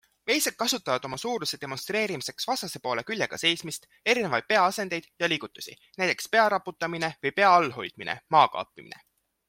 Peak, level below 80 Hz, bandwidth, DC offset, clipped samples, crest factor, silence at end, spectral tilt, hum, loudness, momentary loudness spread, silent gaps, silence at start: -6 dBFS; -70 dBFS; 16.5 kHz; under 0.1%; under 0.1%; 22 dB; 0.55 s; -2.5 dB/octave; none; -26 LUFS; 12 LU; none; 0.25 s